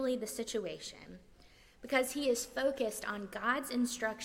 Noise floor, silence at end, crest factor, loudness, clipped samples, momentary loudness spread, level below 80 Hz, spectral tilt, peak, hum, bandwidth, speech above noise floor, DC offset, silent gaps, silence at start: -61 dBFS; 0 s; 20 dB; -35 LUFS; under 0.1%; 13 LU; -64 dBFS; -2.5 dB/octave; -16 dBFS; none; 16.5 kHz; 25 dB; under 0.1%; none; 0 s